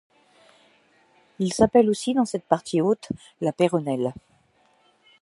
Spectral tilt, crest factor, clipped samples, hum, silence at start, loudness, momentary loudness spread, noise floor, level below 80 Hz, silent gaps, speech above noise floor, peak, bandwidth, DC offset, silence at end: -6 dB/octave; 22 dB; under 0.1%; none; 1.4 s; -23 LUFS; 11 LU; -62 dBFS; -56 dBFS; none; 40 dB; -2 dBFS; 11.5 kHz; under 0.1%; 1.1 s